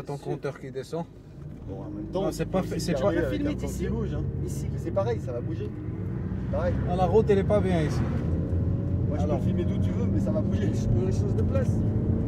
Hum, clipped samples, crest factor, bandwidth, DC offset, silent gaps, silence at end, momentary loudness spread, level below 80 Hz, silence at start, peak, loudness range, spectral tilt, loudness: none; under 0.1%; 16 dB; 14 kHz; under 0.1%; none; 0 s; 11 LU; -38 dBFS; 0 s; -10 dBFS; 5 LU; -8 dB/octave; -27 LUFS